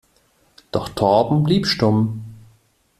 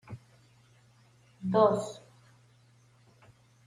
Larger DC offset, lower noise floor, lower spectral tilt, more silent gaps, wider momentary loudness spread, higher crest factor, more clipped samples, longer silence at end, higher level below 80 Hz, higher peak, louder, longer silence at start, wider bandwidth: neither; about the same, -60 dBFS vs -62 dBFS; about the same, -6.5 dB/octave vs -7 dB/octave; neither; second, 12 LU vs 25 LU; second, 18 dB vs 24 dB; neither; second, 0.6 s vs 1.7 s; first, -48 dBFS vs -72 dBFS; first, -2 dBFS vs -12 dBFS; first, -19 LUFS vs -28 LUFS; first, 0.75 s vs 0.1 s; first, 14 kHz vs 11.5 kHz